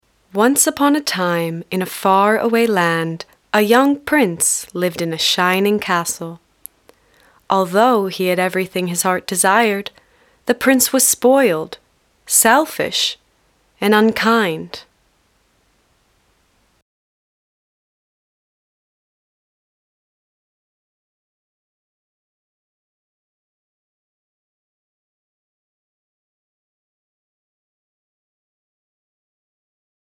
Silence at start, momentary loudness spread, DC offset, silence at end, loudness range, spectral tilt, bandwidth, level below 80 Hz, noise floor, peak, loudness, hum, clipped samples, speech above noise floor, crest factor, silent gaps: 0.35 s; 12 LU; under 0.1%; 15.2 s; 5 LU; -3 dB/octave; 18.5 kHz; -62 dBFS; -60 dBFS; 0 dBFS; -16 LUFS; none; under 0.1%; 44 dB; 20 dB; none